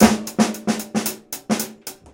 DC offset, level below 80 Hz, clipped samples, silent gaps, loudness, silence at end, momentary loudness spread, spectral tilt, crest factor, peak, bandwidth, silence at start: under 0.1%; -48 dBFS; under 0.1%; none; -22 LUFS; 0.2 s; 11 LU; -4 dB/octave; 20 dB; 0 dBFS; 17.5 kHz; 0 s